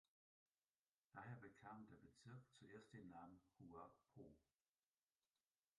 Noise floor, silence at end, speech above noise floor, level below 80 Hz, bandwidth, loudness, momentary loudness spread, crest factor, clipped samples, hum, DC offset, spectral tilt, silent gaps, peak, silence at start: under -90 dBFS; 1.35 s; over 26 dB; -88 dBFS; 10.5 kHz; -64 LUFS; 8 LU; 20 dB; under 0.1%; none; under 0.1%; -6.5 dB/octave; none; -44 dBFS; 1.15 s